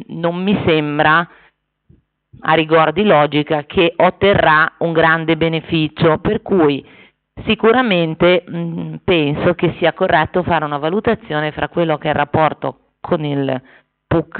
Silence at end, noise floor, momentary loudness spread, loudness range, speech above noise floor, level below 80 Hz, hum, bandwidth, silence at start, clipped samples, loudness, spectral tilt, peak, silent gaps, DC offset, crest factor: 0 s; -54 dBFS; 9 LU; 4 LU; 39 dB; -44 dBFS; none; 4.6 kHz; 0 s; under 0.1%; -15 LUFS; -4 dB/octave; -2 dBFS; none; under 0.1%; 14 dB